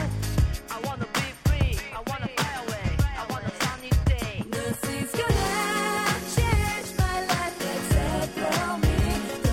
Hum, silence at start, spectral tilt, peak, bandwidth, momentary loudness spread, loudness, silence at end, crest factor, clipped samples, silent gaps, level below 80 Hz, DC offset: none; 0 s; -5 dB/octave; -8 dBFS; 16.5 kHz; 6 LU; -27 LUFS; 0 s; 16 dB; under 0.1%; none; -32 dBFS; under 0.1%